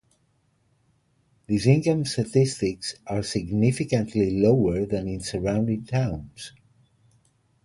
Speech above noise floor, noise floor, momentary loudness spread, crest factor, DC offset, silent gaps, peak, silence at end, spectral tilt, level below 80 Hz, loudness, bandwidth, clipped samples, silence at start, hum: 44 dB; -67 dBFS; 10 LU; 20 dB; under 0.1%; none; -4 dBFS; 1.15 s; -6.5 dB/octave; -48 dBFS; -24 LUFS; 11.5 kHz; under 0.1%; 1.5 s; none